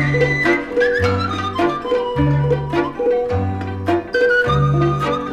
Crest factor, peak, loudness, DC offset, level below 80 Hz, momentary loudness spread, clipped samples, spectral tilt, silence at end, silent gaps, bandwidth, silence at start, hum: 14 dB; -4 dBFS; -18 LUFS; under 0.1%; -36 dBFS; 6 LU; under 0.1%; -7 dB/octave; 0 s; none; 9 kHz; 0 s; none